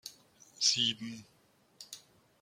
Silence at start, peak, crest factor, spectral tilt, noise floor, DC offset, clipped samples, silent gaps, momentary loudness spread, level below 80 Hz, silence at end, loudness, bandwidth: 0.05 s; -14 dBFS; 24 dB; -0.5 dB/octave; -61 dBFS; under 0.1%; under 0.1%; none; 23 LU; -80 dBFS; 0.45 s; -30 LUFS; 16.5 kHz